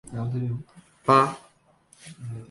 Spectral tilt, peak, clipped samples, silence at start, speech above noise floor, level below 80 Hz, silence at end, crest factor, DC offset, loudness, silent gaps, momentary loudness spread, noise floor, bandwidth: -6.5 dB/octave; -6 dBFS; under 0.1%; 0.05 s; 35 dB; -60 dBFS; 0.05 s; 22 dB; under 0.1%; -24 LUFS; none; 22 LU; -60 dBFS; 11.5 kHz